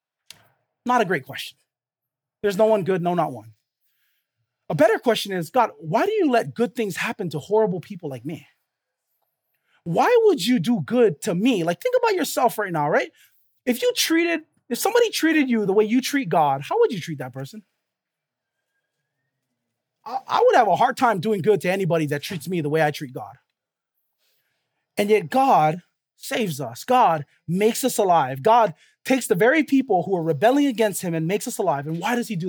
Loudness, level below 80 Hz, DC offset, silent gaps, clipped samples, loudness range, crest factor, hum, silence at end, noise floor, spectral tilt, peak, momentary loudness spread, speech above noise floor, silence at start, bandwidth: -21 LUFS; -76 dBFS; under 0.1%; none; under 0.1%; 6 LU; 20 dB; none; 0 s; -88 dBFS; -5 dB/octave; -4 dBFS; 14 LU; 67 dB; 0.85 s; over 20 kHz